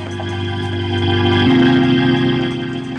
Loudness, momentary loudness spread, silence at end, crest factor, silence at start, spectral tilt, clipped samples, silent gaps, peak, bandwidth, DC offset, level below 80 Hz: -15 LUFS; 10 LU; 0 s; 12 dB; 0 s; -7 dB/octave; under 0.1%; none; -2 dBFS; 9 kHz; under 0.1%; -44 dBFS